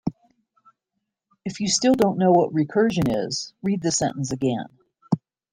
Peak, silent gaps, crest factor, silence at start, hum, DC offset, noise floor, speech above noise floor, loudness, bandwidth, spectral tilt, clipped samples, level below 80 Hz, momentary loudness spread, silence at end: -6 dBFS; none; 18 dB; 0.05 s; none; under 0.1%; -80 dBFS; 59 dB; -22 LUFS; 16 kHz; -5 dB/octave; under 0.1%; -56 dBFS; 13 LU; 0.35 s